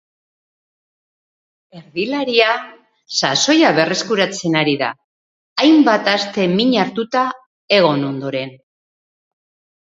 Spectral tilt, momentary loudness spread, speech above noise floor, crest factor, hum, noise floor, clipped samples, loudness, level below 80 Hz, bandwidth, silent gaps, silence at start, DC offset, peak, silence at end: -4 dB/octave; 12 LU; over 74 dB; 18 dB; none; under -90 dBFS; under 0.1%; -16 LUFS; -66 dBFS; 7.8 kHz; 5.04-5.56 s, 7.46-7.68 s; 1.75 s; under 0.1%; 0 dBFS; 1.35 s